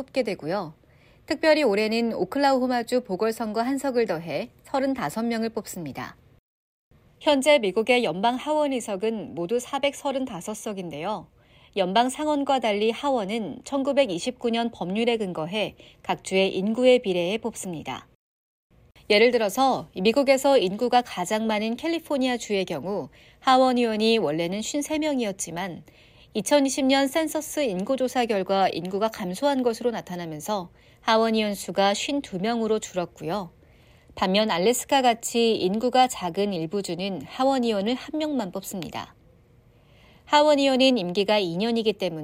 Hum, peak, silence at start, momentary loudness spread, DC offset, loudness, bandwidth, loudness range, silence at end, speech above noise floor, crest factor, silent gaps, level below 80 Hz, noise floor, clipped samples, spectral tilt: none; -6 dBFS; 0 s; 12 LU; under 0.1%; -24 LUFS; 16 kHz; 4 LU; 0 s; 32 dB; 18 dB; 6.39-6.91 s, 18.15-18.70 s; -60 dBFS; -56 dBFS; under 0.1%; -4 dB/octave